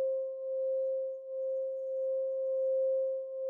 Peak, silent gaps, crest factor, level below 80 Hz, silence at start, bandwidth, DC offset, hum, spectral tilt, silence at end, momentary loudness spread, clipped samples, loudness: -26 dBFS; none; 8 dB; under -90 dBFS; 0 s; 1.1 kHz; under 0.1%; none; -5 dB/octave; 0 s; 6 LU; under 0.1%; -34 LUFS